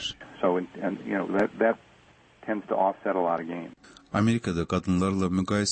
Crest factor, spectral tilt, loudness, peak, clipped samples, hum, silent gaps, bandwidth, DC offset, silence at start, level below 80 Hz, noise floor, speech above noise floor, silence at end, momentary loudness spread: 16 dB; -5.5 dB/octave; -27 LUFS; -12 dBFS; under 0.1%; none; none; 8.8 kHz; under 0.1%; 0 s; -56 dBFS; -57 dBFS; 31 dB; 0 s; 10 LU